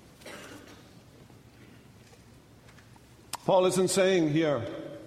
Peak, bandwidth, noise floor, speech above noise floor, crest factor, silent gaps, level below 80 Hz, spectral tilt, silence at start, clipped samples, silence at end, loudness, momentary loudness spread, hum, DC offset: -10 dBFS; 16 kHz; -55 dBFS; 30 dB; 20 dB; none; -64 dBFS; -5 dB/octave; 0.25 s; under 0.1%; 0 s; -26 LUFS; 22 LU; none; under 0.1%